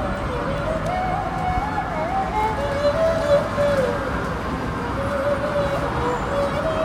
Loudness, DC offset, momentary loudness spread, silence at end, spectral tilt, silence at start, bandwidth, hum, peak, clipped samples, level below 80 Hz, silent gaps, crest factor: -22 LUFS; under 0.1%; 6 LU; 0 s; -6.5 dB/octave; 0 s; 15.5 kHz; none; -6 dBFS; under 0.1%; -34 dBFS; none; 16 dB